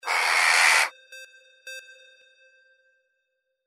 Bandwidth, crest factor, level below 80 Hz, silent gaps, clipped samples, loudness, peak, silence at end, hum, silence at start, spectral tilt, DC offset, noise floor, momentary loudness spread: 16 kHz; 22 dB; under -90 dBFS; none; under 0.1%; -19 LUFS; -6 dBFS; 1.85 s; none; 0.05 s; 5 dB/octave; under 0.1%; -78 dBFS; 24 LU